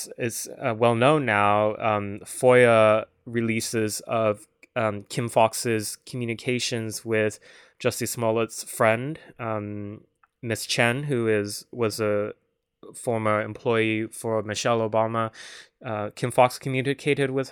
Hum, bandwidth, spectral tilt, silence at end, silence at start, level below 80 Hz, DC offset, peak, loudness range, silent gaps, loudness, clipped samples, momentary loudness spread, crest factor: none; over 20 kHz; -4.5 dB/octave; 0 s; 0 s; -68 dBFS; under 0.1%; -4 dBFS; 6 LU; none; -24 LUFS; under 0.1%; 12 LU; 20 dB